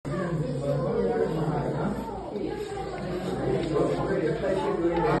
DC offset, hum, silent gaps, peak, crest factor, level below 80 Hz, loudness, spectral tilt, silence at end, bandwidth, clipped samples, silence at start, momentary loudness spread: under 0.1%; none; none; -12 dBFS; 16 dB; -46 dBFS; -28 LUFS; -7.5 dB/octave; 0 s; 12 kHz; under 0.1%; 0.05 s; 7 LU